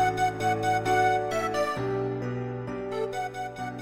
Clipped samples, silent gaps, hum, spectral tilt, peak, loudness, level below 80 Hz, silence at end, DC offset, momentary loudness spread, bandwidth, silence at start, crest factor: under 0.1%; none; none; -5.5 dB/octave; -14 dBFS; -28 LUFS; -56 dBFS; 0 s; under 0.1%; 10 LU; 16 kHz; 0 s; 14 dB